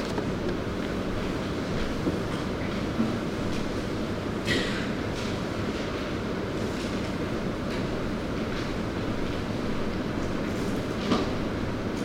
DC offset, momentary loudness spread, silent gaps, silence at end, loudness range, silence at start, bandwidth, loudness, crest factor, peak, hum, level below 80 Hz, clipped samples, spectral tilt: under 0.1%; 4 LU; none; 0 s; 1 LU; 0 s; 16 kHz; -30 LUFS; 18 dB; -12 dBFS; none; -40 dBFS; under 0.1%; -6 dB/octave